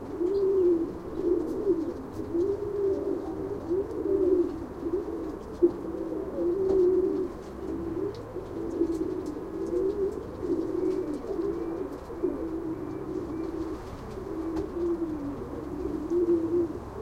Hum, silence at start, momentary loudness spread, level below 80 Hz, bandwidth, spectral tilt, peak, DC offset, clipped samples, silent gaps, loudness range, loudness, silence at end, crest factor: none; 0 s; 11 LU; -48 dBFS; 9 kHz; -8.5 dB/octave; -10 dBFS; under 0.1%; under 0.1%; none; 5 LU; -30 LUFS; 0 s; 18 dB